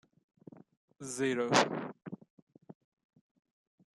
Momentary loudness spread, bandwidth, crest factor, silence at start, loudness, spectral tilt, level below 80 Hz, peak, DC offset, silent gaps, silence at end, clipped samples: 20 LU; 13 kHz; 28 dB; 1 s; -32 LUFS; -3.5 dB/octave; -80 dBFS; -10 dBFS; under 0.1%; 2.30-2.47 s; 1.25 s; under 0.1%